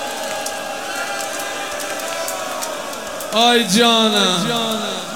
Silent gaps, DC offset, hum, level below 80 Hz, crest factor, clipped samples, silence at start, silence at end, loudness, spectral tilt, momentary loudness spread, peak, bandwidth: none; 0.6%; none; -60 dBFS; 20 dB; under 0.1%; 0 s; 0 s; -18 LUFS; -2.5 dB/octave; 12 LU; 0 dBFS; 19 kHz